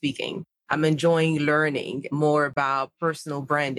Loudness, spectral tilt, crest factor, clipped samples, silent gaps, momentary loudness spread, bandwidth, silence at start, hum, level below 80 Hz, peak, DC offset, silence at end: -24 LUFS; -6 dB/octave; 18 dB; under 0.1%; none; 10 LU; 12.5 kHz; 0.05 s; none; -66 dBFS; -6 dBFS; under 0.1%; 0 s